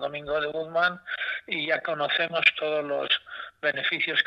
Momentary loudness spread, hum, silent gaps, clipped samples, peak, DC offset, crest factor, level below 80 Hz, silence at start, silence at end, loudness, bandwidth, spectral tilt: 8 LU; none; none; under 0.1%; -6 dBFS; under 0.1%; 22 dB; -66 dBFS; 0 s; 0 s; -26 LUFS; 8.2 kHz; -4.5 dB/octave